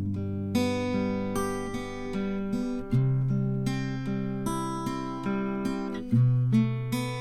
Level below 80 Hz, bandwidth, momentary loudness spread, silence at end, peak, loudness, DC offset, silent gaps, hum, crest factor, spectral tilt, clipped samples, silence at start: -46 dBFS; 13.5 kHz; 8 LU; 0 s; -12 dBFS; -29 LUFS; under 0.1%; none; none; 14 dB; -7 dB/octave; under 0.1%; 0 s